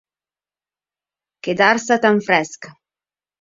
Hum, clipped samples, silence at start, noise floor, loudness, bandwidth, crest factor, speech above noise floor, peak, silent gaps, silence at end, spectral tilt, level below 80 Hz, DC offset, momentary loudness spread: 50 Hz at -50 dBFS; under 0.1%; 1.45 s; under -90 dBFS; -16 LUFS; 7.8 kHz; 20 dB; over 73 dB; 0 dBFS; none; 0.7 s; -4 dB/octave; -66 dBFS; under 0.1%; 15 LU